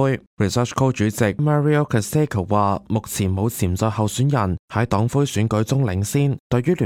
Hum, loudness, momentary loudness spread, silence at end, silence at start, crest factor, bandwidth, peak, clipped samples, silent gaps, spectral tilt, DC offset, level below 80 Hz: none; -20 LUFS; 4 LU; 0 s; 0 s; 16 dB; 16.5 kHz; -4 dBFS; under 0.1%; 0.27-0.37 s, 4.59-4.68 s, 6.40-6.50 s; -6.5 dB/octave; under 0.1%; -46 dBFS